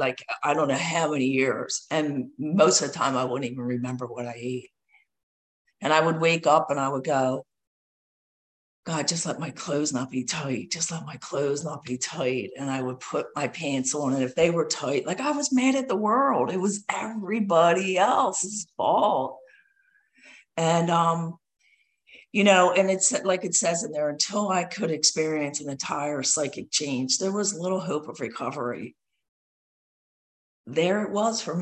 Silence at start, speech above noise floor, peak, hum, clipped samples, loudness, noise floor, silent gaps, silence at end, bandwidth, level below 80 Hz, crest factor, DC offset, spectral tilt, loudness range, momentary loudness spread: 0 s; 40 dB; -4 dBFS; none; under 0.1%; -25 LUFS; -66 dBFS; 5.23-5.65 s, 7.67-8.83 s, 29.28-30.64 s; 0 s; 10.5 kHz; -70 dBFS; 22 dB; under 0.1%; -3.5 dB/octave; 6 LU; 10 LU